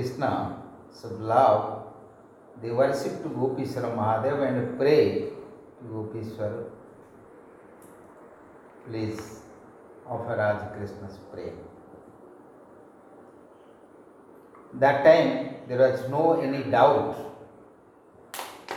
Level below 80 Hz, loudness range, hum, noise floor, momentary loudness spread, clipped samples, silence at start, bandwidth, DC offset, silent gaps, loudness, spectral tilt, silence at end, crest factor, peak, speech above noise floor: -66 dBFS; 17 LU; none; -54 dBFS; 22 LU; under 0.1%; 0 s; 16 kHz; under 0.1%; none; -25 LUFS; -6.5 dB/octave; 0 s; 22 dB; -6 dBFS; 29 dB